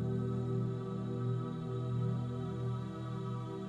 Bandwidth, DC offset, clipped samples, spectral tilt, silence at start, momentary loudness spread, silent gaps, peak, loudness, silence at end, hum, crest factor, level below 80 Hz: 7.4 kHz; under 0.1%; under 0.1%; -9 dB/octave; 0 s; 4 LU; none; -24 dBFS; -38 LUFS; 0 s; none; 12 dB; -62 dBFS